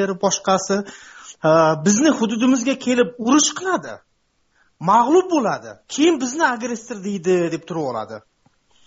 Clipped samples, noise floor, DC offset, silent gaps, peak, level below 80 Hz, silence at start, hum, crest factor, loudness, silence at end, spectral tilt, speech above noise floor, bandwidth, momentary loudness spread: under 0.1%; -65 dBFS; under 0.1%; none; -4 dBFS; -62 dBFS; 0 s; none; 16 dB; -19 LUFS; 0.7 s; -4 dB/octave; 46 dB; 8 kHz; 14 LU